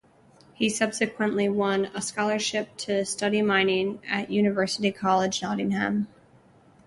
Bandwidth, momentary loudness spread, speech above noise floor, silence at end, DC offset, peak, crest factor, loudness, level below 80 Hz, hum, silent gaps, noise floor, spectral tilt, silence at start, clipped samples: 11.5 kHz; 6 LU; 31 dB; 0.8 s; under 0.1%; -10 dBFS; 18 dB; -25 LUFS; -64 dBFS; none; none; -56 dBFS; -4 dB/octave; 0.6 s; under 0.1%